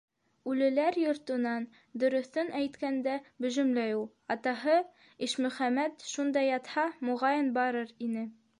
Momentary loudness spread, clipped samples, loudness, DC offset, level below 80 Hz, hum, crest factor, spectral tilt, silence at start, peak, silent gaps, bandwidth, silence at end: 8 LU; under 0.1%; -31 LUFS; under 0.1%; -80 dBFS; none; 16 dB; -4 dB/octave; 0.45 s; -16 dBFS; none; 11 kHz; 0.25 s